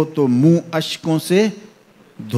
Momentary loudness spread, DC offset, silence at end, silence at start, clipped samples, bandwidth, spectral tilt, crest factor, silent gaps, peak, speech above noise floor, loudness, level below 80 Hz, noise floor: 8 LU; under 0.1%; 0 s; 0 s; under 0.1%; 15 kHz; -6.5 dB/octave; 16 dB; none; -2 dBFS; 33 dB; -17 LUFS; -66 dBFS; -49 dBFS